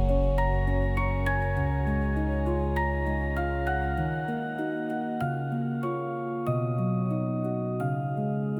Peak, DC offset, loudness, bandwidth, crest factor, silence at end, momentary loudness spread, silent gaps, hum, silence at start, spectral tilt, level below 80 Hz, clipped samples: -14 dBFS; under 0.1%; -28 LUFS; 16.5 kHz; 12 dB; 0 s; 5 LU; none; none; 0 s; -9 dB/octave; -32 dBFS; under 0.1%